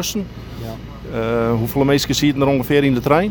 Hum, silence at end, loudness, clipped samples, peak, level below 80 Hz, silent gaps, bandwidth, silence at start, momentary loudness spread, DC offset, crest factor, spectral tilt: none; 0 s; -17 LUFS; under 0.1%; 0 dBFS; -38 dBFS; none; over 20 kHz; 0 s; 15 LU; under 0.1%; 16 dB; -5.5 dB/octave